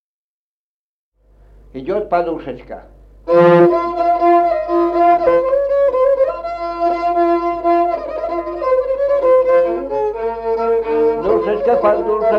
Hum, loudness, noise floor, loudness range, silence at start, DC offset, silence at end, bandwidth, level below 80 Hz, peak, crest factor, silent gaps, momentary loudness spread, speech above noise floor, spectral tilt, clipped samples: 50 Hz at -45 dBFS; -15 LUFS; -48 dBFS; 4 LU; 1.75 s; under 0.1%; 0 s; 5.8 kHz; -44 dBFS; -2 dBFS; 14 dB; none; 11 LU; 33 dB; -8.5 dB/octave; under 0.1%